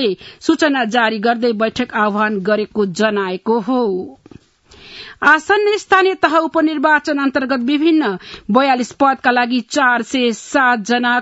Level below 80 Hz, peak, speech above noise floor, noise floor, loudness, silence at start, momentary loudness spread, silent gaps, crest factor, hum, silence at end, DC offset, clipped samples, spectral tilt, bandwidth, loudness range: -56 dBFS; 0 dBFS; 30 dB; -45 dBFS; -15 LUFS; 0 s; 6 LU; none; 16 dB; none; 0 s; under 0.1%; under 0.1%; -4.5 dB/octave; 8 kHz; 4 LU